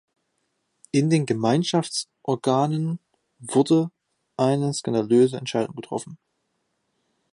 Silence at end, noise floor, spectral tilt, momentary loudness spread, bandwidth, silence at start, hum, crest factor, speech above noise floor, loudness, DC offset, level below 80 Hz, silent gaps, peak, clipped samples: 1.2 s; -74 dBFS; -6 dB/octave; 13 LU; 11.5 kHz; 0.95 s; none; 18 dB; 52 dB; -23 LUFS; under 0.1%; -70 dBFS; none; -6 dBFS; under 0.1%